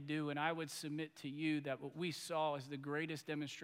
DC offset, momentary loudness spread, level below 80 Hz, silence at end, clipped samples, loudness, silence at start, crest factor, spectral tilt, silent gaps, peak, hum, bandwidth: under 0.1%; 6 LU; -90 dBFS; 0 s; under 0.1%; -42 LUFS; 0 s; 18 dB; -5 dB/octave; none; -24 dBFS; none; 16 kHz